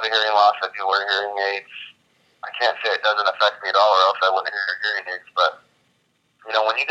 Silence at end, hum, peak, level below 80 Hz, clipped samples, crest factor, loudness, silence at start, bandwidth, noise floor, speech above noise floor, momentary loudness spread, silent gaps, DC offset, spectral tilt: 0 s; none; -2 dBFS; -82 dBFS; under 0.1%; 18 dB; -20 LUFS; 0 s; 8.4 kHz; -66 dBFS; 46 dB; 11 LU; none; under 0.1%; 0 dB/octave